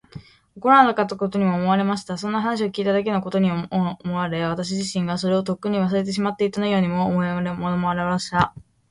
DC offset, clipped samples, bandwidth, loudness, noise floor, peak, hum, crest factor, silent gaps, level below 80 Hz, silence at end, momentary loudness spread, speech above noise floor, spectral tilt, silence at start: under 0.1%; under 0.1%; 11 kHz; -22 LUFS; -43 dBFS; -2 dBFS; none; 20 dB; none; -54 dBFS; 0.3 s; 6 LU; 22 dB; -6 dB/octave; 0.15 s